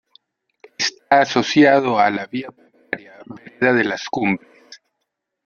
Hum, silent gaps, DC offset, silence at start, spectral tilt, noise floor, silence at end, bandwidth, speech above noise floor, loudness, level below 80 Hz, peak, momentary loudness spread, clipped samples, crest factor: none; none; under 0.1%; 0.8 s; -4.5 dB/octave; -77 dBFS; 0.7 s; 7.2 kHz; 60 dB; -18 LUFS; -62 dBFS; -2 dBFS; 19 LU; under 0.1%; 18 dB